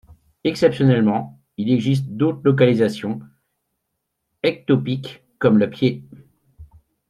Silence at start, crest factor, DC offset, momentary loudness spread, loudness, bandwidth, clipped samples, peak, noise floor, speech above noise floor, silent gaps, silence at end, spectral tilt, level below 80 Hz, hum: 0.45 s; 18 dB; under 0.1%; 12 LU; -19 LUFS; 12 kHz; under 0.1%; -2 dBFS; -76 dBFS; 58 dB; none; 0.45 s; -8 dB/octave; -56 dBFS; none